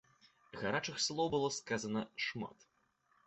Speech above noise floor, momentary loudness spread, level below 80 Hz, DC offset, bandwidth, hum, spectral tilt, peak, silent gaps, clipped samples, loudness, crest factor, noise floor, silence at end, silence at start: 38 dB; 11 LU; -72 dBFS; under 0.1%; 8.2 kHz; none; -3.5 dB/octave; -20 dBFS; none; under 0.1%; -38 LUFS; 20 dB; -76 dBFS; 0.75 s; 0.55 s